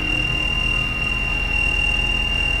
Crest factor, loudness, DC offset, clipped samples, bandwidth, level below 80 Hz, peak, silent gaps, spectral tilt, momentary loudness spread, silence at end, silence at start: 10 dB; -19 LUFS; under 0.1%; under 0.1%; 14 kHz; -26 dBFS; -10 dBFS; none; -3.5 dB/octave; 3 LU; 0 s; 0 s